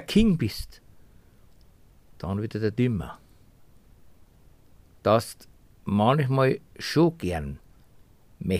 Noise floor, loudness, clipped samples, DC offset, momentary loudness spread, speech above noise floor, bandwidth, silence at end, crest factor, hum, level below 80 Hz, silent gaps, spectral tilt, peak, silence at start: -55 dBFS; -25 LUFS; under 0.1%; 0.1%; 18 LU; 31 dB; 15.5 kHz; 0 s; 20 dB; none; -46 dBFS; none; -7 dB/octave; -8 dBFS; 0 s